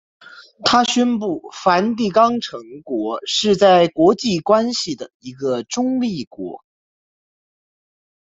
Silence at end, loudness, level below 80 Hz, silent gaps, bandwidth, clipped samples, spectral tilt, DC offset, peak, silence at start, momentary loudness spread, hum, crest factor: 1.7 s; -17 LUFS; -60 dBFS; 5.14-5.20 s, 6.27-6.31 s; 8 kHz; under 0.1%; -4.5 dB/octave; under 0.1%; -2 dBFS; 0.35 s; 16 LU; none; 18 dB